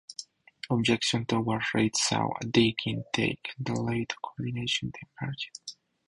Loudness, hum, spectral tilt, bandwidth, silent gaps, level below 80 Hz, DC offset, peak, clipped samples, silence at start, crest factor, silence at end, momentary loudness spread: -29 LUFS; none; -4 dB/octave; 11.5 kHz; none; -60 dBFS; under 0.1%; -8 dBFS; under 0.1%; 0.1 s; 22 dB; 0.35 s; 14 LU